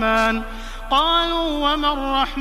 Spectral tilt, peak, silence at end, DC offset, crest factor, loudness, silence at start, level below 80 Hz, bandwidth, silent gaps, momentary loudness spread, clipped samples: -3.5 dB/octave; -4 dBFS; 0 s; under 0.1%; 16 dB; -19 LUFS; 0 s; -32 dBFS; 15.5 kHz; none; 10 LU; under 0.1%